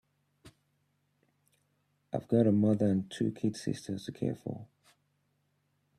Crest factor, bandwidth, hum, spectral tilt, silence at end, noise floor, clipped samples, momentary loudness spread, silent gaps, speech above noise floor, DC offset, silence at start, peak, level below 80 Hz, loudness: 20 dB; 12 kHz; none; -7.5 dB/octave; 1.35 s; -76 dBFS; under 0.1%; 14 LU; none; 46 dB; under 0.1%; 0.45 s; -14 dBFS; -70 dBFS; -31 LUFS